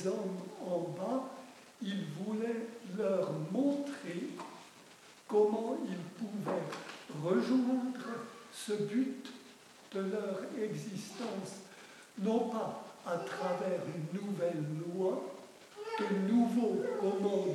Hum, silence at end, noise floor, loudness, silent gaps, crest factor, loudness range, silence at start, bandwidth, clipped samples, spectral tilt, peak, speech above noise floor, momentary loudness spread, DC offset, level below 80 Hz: none; 0 s; -58 dBFS; -36 LUFS; none; 18 dB; 4 LU; 0 s; 14.5 kHz; under 0.1%; -6.5 dB/octave; -18 dBFS; 23 dB; 18 LU; under 0.1%; -90 dBFS